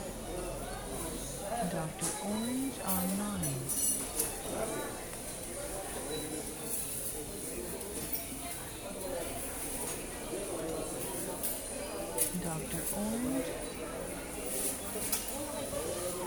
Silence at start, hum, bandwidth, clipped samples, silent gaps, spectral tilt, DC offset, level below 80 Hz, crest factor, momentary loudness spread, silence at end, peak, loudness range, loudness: 0 s; none; 19.5 kHz; under 0.1%; none; -3.5 dB/octave; under 0.1%; -52 dBFS; 22 dB; 8 LU; 0 s; -16 dBFS; 4 LU; -36 LUFS